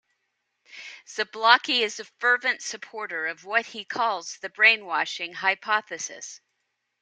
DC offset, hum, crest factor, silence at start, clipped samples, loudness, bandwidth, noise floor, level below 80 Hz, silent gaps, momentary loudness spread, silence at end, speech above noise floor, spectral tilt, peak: under 0.1%; none; 26 dB; 0.75 s; under 0.1%; -24 LUFS; 9.6 kHz; -78 dBFS; -84 dBFS; none; 17 LU; 0.65 s; 52 dB; 0 dB/octave; -2 dBFS